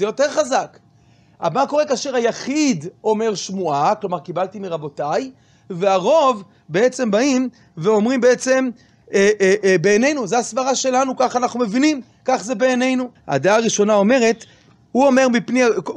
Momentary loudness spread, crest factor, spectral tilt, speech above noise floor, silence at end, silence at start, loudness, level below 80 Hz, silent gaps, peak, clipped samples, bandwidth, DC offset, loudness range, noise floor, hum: 10 LU; 14 dB; -4.5 dB/octave; 35 dB; 0 s; 0 s; -18 LUFS; -64 dBFS; none; -4 dBFS; under 0.1%; 10.5 kHz; under 0.1%; 4 LU; -52 dBFS; none